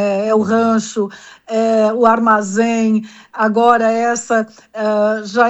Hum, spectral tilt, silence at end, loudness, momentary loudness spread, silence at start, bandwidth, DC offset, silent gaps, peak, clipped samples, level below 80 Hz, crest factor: none; -5 dB/octave; 0 s; -15 LUFS; 10 LU; 0 s; 8.4 kHz; under 0.1%; none; 0 dBFS; under 0.1%; -60 dBFS; 14 dB